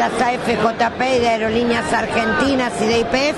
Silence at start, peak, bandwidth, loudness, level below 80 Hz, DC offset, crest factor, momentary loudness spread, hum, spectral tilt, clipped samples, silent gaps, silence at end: 0 s; -2 dBFS; 11.5 kHz; -17 LUFS; -42 dBFS; under 0.1%; 14 dB; 2 LU; none; -4.5 dB/octave; under 0.1%; none; 0 s